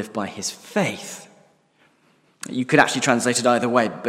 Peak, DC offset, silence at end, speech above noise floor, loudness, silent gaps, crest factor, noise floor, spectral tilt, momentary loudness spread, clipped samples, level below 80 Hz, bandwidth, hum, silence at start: 0 dBFS; under 0.1%; 0 s; 39 dB; -21 LUFS; none; 22 dB; -60 dBFS; -3.5 dB/octave; 17 LU; under 0.1%; -68 dBFS; 16 kHz; none; 0 s